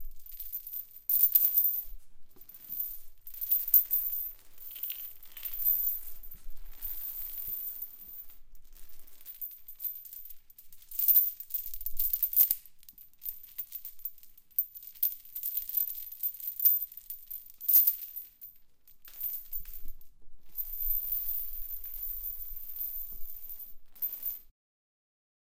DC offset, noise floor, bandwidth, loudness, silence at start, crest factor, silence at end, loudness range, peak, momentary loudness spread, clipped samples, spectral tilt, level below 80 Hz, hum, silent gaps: under 0.1%; -55 dBFS; 17 kHz; -29 LUFS; 0 s; 26 dB; 1 s; 11 LU; -8 dBFS; 22 LU; under 0.1%; -0.5 dB/octave; -52 dBFS; none; none